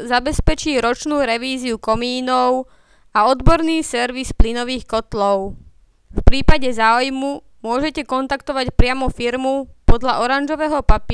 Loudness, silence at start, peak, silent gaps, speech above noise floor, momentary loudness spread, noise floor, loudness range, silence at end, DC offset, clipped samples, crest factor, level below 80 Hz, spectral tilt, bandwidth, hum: -19 LUFS; 0 s; 0 dBFS; none; 29 dB; 7 LU; -45 dBFS; 2 LU; 0 s; under 0.1%; under 0.1%; 16 dB; -22 dBFS; -5 dB/octave; 11 kHz; none